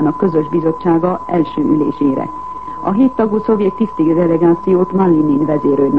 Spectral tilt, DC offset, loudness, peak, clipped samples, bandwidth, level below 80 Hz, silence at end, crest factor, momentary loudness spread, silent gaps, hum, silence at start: -10.5 dB/octave; 1%; -14 LUFS; 0 dBFS; under 0.1%; 4.9 kHz; -46 dBFS; 0 s; 12 dB; 6 LU; none; none; 0 s